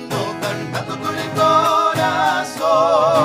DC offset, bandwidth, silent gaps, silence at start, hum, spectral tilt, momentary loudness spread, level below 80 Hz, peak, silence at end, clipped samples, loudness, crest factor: under 0.1%; 16 kHz; none; 0 s; none; -4.5 dB/octave; 10 LU; -58 dBFS; -2 dBFS; 0 s; under 0.1%; -17 LUFS; 14 dB